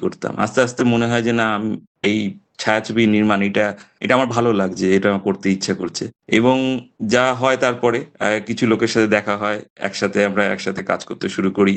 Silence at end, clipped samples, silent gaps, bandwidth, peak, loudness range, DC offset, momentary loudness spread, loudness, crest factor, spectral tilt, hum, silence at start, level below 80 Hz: 0 s; under 0.1%; 1.87-1.95 s, 9.70-9.76 s; 9 kHz; -2 dBFS; 1 LU; under 0.1%; 8 LU; -19 LUFS; 16 dB; -5.5 dB/octave; none; 0 s; -56 dBFS